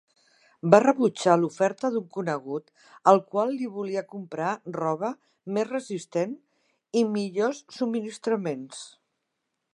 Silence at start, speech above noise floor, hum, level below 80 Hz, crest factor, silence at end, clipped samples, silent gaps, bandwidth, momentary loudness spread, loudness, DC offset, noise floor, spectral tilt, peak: 0.65 s; 55 dB; none; -78 dBFS; 26 dB; 0.85 s; under 0.1%; none; 11.5 kHz; 15 LU; -26 LUFS; under 0.1%; -81 dBFS; -6 dB/octave; 0 dBFS